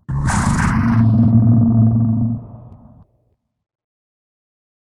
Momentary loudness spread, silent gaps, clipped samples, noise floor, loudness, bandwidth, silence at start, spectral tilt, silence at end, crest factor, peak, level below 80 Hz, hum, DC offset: 7 LU; none; under 0.1%; -65 dBFS; -15 LUFS; 11 kHz; 0.1 s; -7.5 dB/octave; 2.15 s; 16 dB; -2 dBFS; -32 dBFS; none; under 0.1%